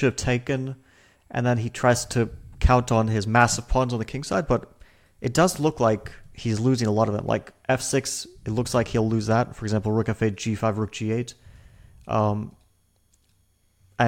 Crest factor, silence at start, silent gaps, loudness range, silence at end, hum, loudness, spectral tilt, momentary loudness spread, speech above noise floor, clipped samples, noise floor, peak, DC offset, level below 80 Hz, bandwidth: 20 dB; 0 s; none; 5 LU; 0 s; none; -24 LUFS; -5.5 dB/octave; 9 LU; 41 dB; under 0.1%; -64 dBFS; -4 dBFS; under 0.1%; -38 dBFS; 16.5 kHz